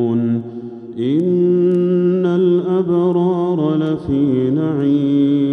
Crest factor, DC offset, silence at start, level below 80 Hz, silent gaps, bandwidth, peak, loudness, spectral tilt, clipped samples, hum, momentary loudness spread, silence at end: 10 dB; under 0.1%; 0 s; -50 dBFS; none; 4 kHz; -6 dBFS; -16 LUFS; -10.5 dB/octave; under 0.1%; none; 6 LU; 0 s